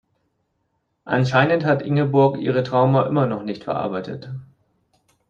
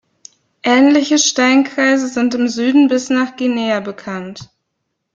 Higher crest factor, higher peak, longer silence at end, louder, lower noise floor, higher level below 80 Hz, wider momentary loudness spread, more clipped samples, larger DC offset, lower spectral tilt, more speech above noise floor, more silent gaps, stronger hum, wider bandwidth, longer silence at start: about the same, 18 dB vs 14 dB; about the same, -2 dBFS vs -2 dBFS; first, 0.85 s vs 0.7 s; second, -20 LUFS vs -14 LUFS; about the same, -71 dBFS vs -73 dBFS; about the same, -60 dBFS vs -62 dBFS; about the same, 13 LU vs 14 LU; neither; neither; first, -8 dB/octave vs -3 dB/octave; second, 52 dB vs 59 dB; neither; neither; about the same, 7.2 kHz vs 7.6 kHz; first, 1.05 s vs 0.65 s